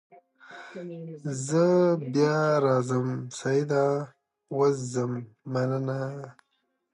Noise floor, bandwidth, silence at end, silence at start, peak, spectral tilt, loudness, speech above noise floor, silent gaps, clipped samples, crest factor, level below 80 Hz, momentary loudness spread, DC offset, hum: -49 dBFS; 11.5 kHz; 0.6 s; 0.45 s; -10 dBFS; -6.5 dB/octave; -26 LUFS; 23 dB; none; under 0.1%; 18 dB; -74 dBFS; 17 LU; under 0.1%; none